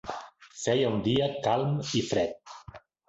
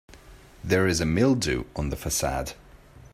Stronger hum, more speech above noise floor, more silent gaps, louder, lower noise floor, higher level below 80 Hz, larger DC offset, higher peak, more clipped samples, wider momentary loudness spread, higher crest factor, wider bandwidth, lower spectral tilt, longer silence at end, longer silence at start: neither; about the same, 23 dB vs 25 dB; neither; second, -28 LUFS vs -25 LUFS; about the same, -50 dBFS vs -49 dBFS; second, -58 dBFS vs -40 dBFS; neither; second, -12 dBFS vs -8 dBFS; neither; first, 19 LU vs 10 LU; about the same, 16 dB vs 20 dB; second, 8.2 kHz vs 16 kHz; about the same, -5.5 dB/octave vs -4.5 dB/octave; first, 0.3 s vs 0.15 s; about the same, 0.05 s vs 0.1 s